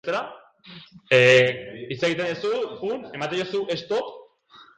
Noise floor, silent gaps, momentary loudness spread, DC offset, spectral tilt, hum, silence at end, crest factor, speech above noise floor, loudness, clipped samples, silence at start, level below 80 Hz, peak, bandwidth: -52 dBFS; none; 17 LU; under 0.1%; -4.5 dB/octave; none; 0.55 s; 20 dB; 29 dB; -22 LUFS; under 0.1%; 0.05 s; -66 dBFS; -4 dBFS; 9.2 kHz